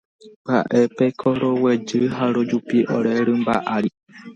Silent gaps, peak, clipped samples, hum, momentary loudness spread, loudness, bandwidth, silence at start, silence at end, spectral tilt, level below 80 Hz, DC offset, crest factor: 0.36-0.45 s; -4 dBFS; under 0.1%; none; 4 LU; -20 LUFS; 7.6 kHz; 0.25 s; 0 s; -7 dB/octave; -60 dBFS; under 0.1%; 16 dB